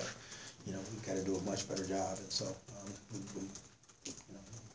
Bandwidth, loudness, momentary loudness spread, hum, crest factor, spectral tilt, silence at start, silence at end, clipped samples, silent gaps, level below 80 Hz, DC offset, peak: 8 kHz; -42 LUFS; 13 LU; none; 18 dB; -4 dB/octave; 0 s; 0 s; under 0.1%; none; -66 dBFS; under 0.1%; -24 dBFS